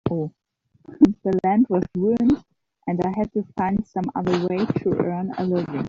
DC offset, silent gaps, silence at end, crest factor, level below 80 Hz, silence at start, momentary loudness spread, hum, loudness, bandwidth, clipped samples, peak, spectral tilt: under 0.1%; none; 0 s; 20 dB; -50 dBFS; 0.05 s; 8 LU; none; -22 LUFS; 7.4 kHz; under 0.1%; -2 dBFS; -8 dB/octave